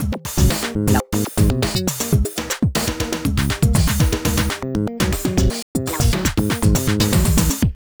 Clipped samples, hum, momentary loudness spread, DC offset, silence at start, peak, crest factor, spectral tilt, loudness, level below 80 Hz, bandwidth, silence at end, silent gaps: under 0.1%; none; 5 LU; under 0.1%; 0 s; -2 dBFS; 16 dB; -5 dB/octave; -19 LUFS; -24 dBFS; over 20 kHz; 0.25 s; 5.62-5.75 s